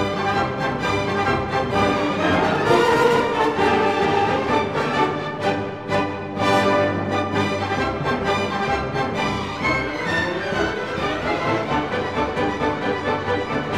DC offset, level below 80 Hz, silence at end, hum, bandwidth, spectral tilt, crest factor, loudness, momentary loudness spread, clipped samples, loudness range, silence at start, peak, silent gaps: 0.3%; -44 dBFS; 0 s; none; 15.5 kHz; -5.5 dB/octave; 16 dB; -21 LUFS; 6 LU; under 0.1%; 4 LU; 0 s; -4 dBFS; none